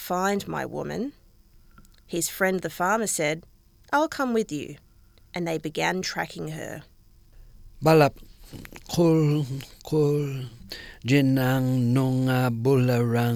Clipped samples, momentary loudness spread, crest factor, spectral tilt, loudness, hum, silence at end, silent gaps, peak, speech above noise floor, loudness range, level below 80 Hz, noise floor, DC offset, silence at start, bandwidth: under 0.1%; 16 LU; 18 dB; -6 dB/octave; -25 LUFS; none; 0 s; none; -6 dBFS; 31 dB; 5 LU; -52 dBFS; -55 dBFS; under 0.1%; 0 s; 18 kHz